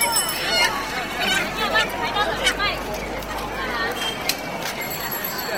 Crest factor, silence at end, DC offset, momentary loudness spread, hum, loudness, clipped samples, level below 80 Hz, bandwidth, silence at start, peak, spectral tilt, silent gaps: 20 dB; 0 s; 0.2%; 8 LU; none; -22 LUFS; under 0.1%; -42 dBFS; 17 kHz; 0 s; -4 dBFS; -1.5 dB/octave; none